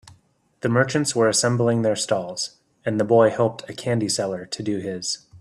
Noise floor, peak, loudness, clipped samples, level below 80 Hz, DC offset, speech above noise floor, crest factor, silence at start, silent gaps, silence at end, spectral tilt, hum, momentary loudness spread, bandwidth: -60 dBFS; -4 dBFS; -22 LUFS; under 0.1%; -62 dBFS; under 0.1%; 39 dB; 18 dB; 0.05 s; none; 0.05 s; -4.5 dB/octave; none; 11 LU; 13 kHz